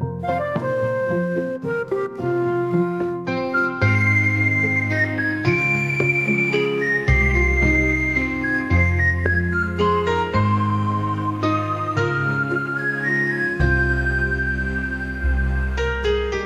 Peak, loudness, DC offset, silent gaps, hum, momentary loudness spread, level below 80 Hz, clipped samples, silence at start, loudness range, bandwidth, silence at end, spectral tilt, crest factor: -4 dBFS; -20 LUFS; under 0.1%; none; none; 7 LU; -30 dBFS; under 0.1%; 0 s; 3 LU; 11.5 kHz; 0 s; -7 dB/octave; 16 dB